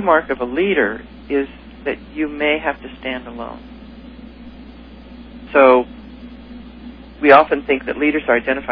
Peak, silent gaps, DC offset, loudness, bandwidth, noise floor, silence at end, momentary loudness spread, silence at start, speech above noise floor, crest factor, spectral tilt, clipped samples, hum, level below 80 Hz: 0 dBFS; none; under 0.1%; -17 LUFS; 5.4 kHz; -38 dBFS; 0 s; 27 LU; 0 s; 22 dB; 18 dB; -8 dB/octave; under 0.1%; 60 Hz at -40 dBFS; -42 dBFS